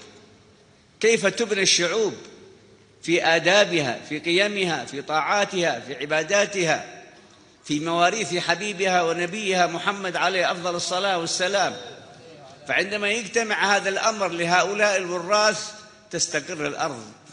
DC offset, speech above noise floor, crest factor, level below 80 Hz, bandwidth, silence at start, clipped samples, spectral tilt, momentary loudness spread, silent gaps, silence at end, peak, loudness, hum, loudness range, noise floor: under 0.1%; 32 dB; 22 dB; -68 dBFS; 10 kHz; 0 s; under 0.1%; -2.5 dB/octave; 10 LU; none; 0 s; -2 dBFS; -22 LUFS; none; 3 LU; -55 dBFS